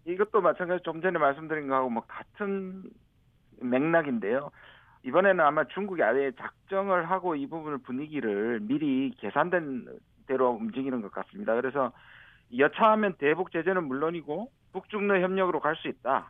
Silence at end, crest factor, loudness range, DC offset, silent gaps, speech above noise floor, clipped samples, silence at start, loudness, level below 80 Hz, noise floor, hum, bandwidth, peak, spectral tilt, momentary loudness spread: 0 s; 20 dB; 4 LU; under 0.1%; none; 35 dB; under 0.1%; 0.05 s; -28 LUFS; -68 dBFS; -63 dBFS; none; 3.9 kHz; -8 dBFS; -9 dB/octave; 12 LU